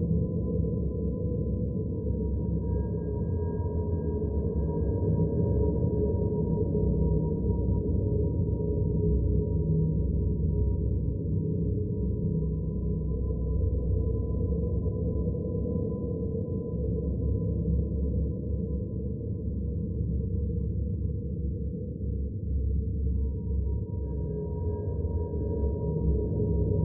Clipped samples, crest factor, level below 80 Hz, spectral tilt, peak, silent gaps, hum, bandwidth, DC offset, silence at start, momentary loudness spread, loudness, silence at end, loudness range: under 0.1%; 14 dB; -32 dBFS; -14.5 dB/octave; -14 dBFS; none; none; 1.7 kHz; under 0.1%; 0 s; 5 LU; -30 LUFS; 0 s; 4 LU